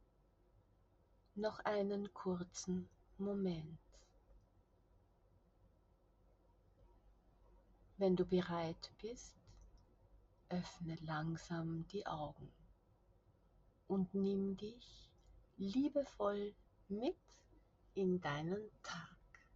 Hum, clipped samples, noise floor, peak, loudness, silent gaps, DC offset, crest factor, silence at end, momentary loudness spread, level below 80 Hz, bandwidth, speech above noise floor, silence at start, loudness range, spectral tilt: none; under 0.1%; -73 dBFS; -24 dBFS; -43 LUFS; none; under 0.1%; 20 dB; 0.4 s; 17 LU; -68 dBFS; 7.6 kHz; 31 dB; 1.35 s; 5 LU; -6.5 dB/octave